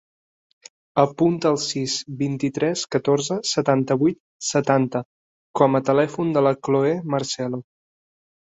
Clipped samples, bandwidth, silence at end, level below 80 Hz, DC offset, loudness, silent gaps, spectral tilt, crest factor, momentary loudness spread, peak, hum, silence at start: under 0.1%; 8.2 kHz; 0.95 s; -64 dBFS; under 0.1%; -21 LUFS; 4.20-4.40 s, 5.05-5.54 s; -5 dB/octave; 20 dB; 7 LU; -2 dBFS; none; 0.95 s